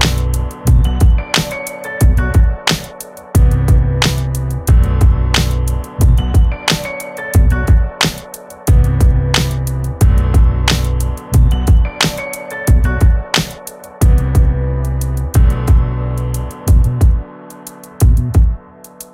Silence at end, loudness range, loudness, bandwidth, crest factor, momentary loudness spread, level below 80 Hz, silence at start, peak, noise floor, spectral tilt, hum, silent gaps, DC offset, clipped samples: 0.1 s; 2 LU; -14 LUFS; 16 kHz; 12 dB; 11 LU; -14 dBFS; 0 s; 0 dBFS; -36 dBFS; -5 dB/octave; none; none; under 0.1%; under 0.1%